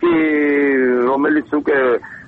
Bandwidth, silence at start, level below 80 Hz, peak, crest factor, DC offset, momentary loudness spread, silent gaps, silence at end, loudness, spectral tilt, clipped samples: 4.4 kHz; 0 s; -54 dBFS; -6 dBFS; 10 dB; under 0.1%; 3 LU; none; 0.05 s; -16 LUFS; -8 dB/octave; under 0.1%